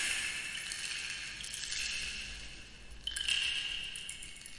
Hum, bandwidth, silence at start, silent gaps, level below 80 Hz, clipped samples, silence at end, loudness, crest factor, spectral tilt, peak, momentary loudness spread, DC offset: none; 11.5 kHz; 0 s; none; -56 dBFS; under 0.1%; 0 s; -36 LUFS; 22 dB; 1 dB/octave; -18 dBFS; 14 LU; under 0.1%